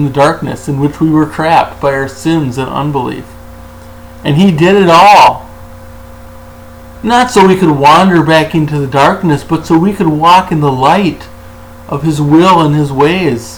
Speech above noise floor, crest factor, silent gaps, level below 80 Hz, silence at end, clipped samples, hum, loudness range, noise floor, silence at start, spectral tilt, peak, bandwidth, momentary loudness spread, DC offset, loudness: 23 dB; 10 dB; none; -36 dBFS; 0 s; 0.5%; none; 5 LU; -31 dBFS; 0 s; -6 dB/octave; 0 dBFS; over 20 kHz; 11 LU; under 0.1%; -9 LUFS